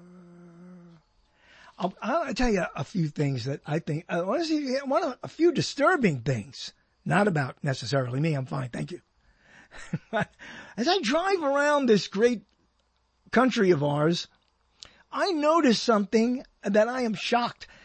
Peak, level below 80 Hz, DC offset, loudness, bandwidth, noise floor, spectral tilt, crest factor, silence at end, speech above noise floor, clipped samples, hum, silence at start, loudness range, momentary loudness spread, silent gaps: -8 dBFS; -52 dBFS; under 0.1%; -26 LUFS; 8.8 kHz; -70 dBFS; -5.5 dB/octave; 18 dB; 0.2 s; 45 dB; under 0.1%; none; 0.15 s; 6 LU; 13 LU; none